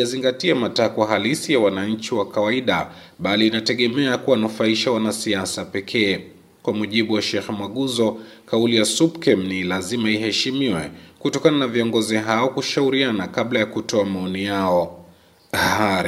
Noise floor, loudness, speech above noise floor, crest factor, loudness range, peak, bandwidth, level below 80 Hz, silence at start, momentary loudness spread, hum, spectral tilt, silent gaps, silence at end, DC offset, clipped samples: -51 dBFS; -20 LUFS; 30 dB; 18 dB; 2 LU; -2 dBFS; 16 kHz; -60 dBFS; 0 s; 7 LU; none; -4 dB/octave; none; 0 s; under 0.1%; under 0.1%